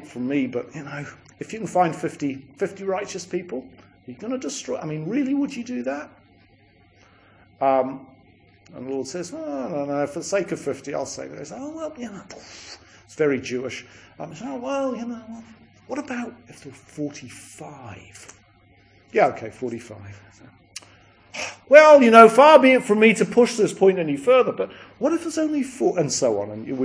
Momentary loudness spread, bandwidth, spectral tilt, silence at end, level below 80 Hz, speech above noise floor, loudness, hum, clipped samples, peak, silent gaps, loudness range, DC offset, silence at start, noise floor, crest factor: 25 LU; 10.5 kHz; -4.5 dB/octave; 0 s; -64 dBFS; 35 dB; -20 LUFS; none; under 0.1%; 0 dBFS; none; 17 LU; under 0.1%; 0 s; -56 dBFS; 22 dB